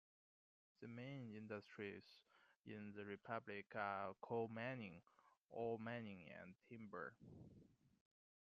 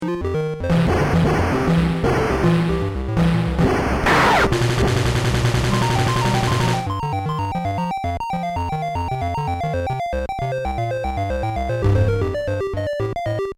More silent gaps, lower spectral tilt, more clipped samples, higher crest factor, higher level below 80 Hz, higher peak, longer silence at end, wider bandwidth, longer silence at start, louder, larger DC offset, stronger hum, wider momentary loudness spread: first, 2.56-2.64 s, 5.40-5.45 s vs none; about the same, -5 dB/octave vs -6 dB/octave; neither; first, 22 dB vs 12 dB; second, -88 dBFS vs -30 dBFS; second, -32 dBFS vs -6 dBFS; first, 0.55 s vs 0.05 s; second, 7.2 kHz vs 15.5 kHz; first, 0.8 s vs 0 s; second, -52 LUFS vs -20 LUFS; neither; neither; first, 16 LU vs 6 LU